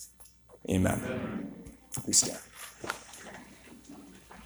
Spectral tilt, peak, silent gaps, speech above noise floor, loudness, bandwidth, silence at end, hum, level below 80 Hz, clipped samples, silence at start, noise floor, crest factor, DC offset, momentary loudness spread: -3 dB/octave; -8 dBFS; none; 26 dB; -31 LUFS; over 20 kHz; 0 s; none; -58 dBFS; under 0.1%; 0 s; -56 dBFS; 26 dB; under 0.1%; 25 LU